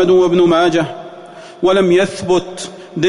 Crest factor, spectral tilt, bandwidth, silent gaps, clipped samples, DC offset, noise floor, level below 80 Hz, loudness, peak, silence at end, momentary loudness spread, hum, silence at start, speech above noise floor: 10 dB; -5.5 dB/octave; 11 kHz; none; under 0.1%; under 0.1%; -35 dBFS; -48 dBFS; -13 LUFS; -4 dBFS; 0 s; 18 LU; none; 0 s; 22 dB